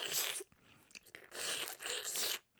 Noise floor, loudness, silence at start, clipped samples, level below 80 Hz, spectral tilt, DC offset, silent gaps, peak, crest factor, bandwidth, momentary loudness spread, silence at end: -66 dBFS; -38 LUFS; 0 s; under 0.1%; -80 dBFS; 1 dB/octave; under 0.1%; none; -20 dBFS; 22 dB; over 20 kHz; 20 LU; 0.2 s